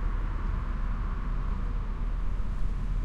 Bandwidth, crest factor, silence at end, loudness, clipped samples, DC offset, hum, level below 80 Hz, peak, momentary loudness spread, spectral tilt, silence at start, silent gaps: 4.7 kHz; 10 dB; 0 s; -35 LUFS; under 0.1%; under 0.1%; none; -30 dBFS; -18 dBFS; 1 LU; -8 dB/octave; 0 s; none